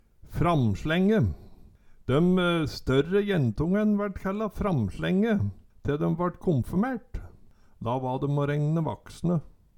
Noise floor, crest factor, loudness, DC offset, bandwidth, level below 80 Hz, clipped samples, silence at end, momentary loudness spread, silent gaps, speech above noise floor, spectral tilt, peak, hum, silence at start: -53 dBFS; 16 dB; -27 LUFS; under 0.1%; 17 kHz; -44 dBFS; under 0.1%; 0.3 s; 10 LU; none; 27 dB; -8 dB/octave; -10 dBFS; none; 0.25 s